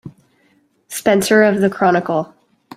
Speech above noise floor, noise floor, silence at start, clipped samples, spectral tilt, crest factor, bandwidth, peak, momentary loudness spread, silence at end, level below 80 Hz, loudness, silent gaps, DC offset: 44 dB; -58 dBFS; 0.05 s; under 0.1%; -5 dB/octave; 16 dB; 16 kHz; -2 dBFS; 13 LU; 0.5 s; -58 dBFS; -15 LUFS; none; under 0.1%